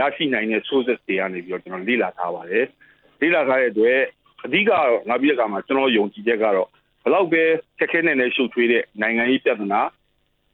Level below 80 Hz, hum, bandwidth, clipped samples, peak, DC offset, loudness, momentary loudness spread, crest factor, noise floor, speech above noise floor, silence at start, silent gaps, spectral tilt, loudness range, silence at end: -70 dBFS; none; 4.3 kHz; under 0.1%; -6 dBFS; under 0.1%; -20 LUFS; 9 LU; 16 dB; -66 dBFS; 46 dB; 0 s; none; -8 dB/octave; 3 LU; 0.65 s